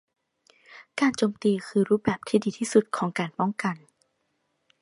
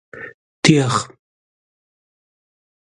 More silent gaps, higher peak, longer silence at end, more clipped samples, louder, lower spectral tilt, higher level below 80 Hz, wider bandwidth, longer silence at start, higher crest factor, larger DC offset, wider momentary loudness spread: second, none vs 0.34-0.63 s; second, -6 dBFS vs 0 dBFS; second, 1.05 s vs 1.85 s; neither; second, -26 LUFS vs -16 LUFS; about the same, -5.5 dB/octave vs -5 dB/octave; second, -64 dBFS vs -58 dBFS; about the same, 11.5 kHz vs 11.5 kHz; first, 0.7 s vs 0.15 s; about the same, 20 dB vs 22 dB; neither; second, 7 LU vs 21 LU